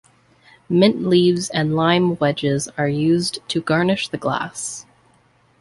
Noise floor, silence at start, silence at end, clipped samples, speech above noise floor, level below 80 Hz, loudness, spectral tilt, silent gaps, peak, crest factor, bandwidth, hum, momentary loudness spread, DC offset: -57 dBFS; 0.7 s; 0.8 s; under 0.1%; 39 dB; -56 dBFS; -19 LUFS; -5 dB/octave; none; -2 dBFS; 18 dB; 11.5 kHz; none; 8 LU; under 0.1%